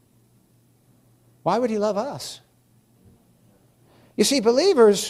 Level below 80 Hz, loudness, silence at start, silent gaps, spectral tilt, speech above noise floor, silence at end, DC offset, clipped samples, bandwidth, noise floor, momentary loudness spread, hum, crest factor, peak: -66 dBFS; -21 LUFS; 1.45 s; none; -4 dB/octave; 40 dB; 0 s; under 0.1%; under 0.1%; 15 kHz; -60 dBFS; 20 LU; none; 18 dB; -4 dBFS